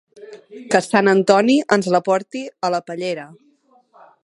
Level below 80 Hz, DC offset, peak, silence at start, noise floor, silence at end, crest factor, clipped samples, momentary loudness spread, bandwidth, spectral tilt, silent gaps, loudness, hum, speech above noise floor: -68 dBFS; under 0.1%; 0 dBFS; 0.2 s; -56 dBFS; 0.9 s; 20 dB; under 0.1%; 16 LU; 11.5 kHz; -5 dB/octave; none; -17 LUFS; none; 39 dB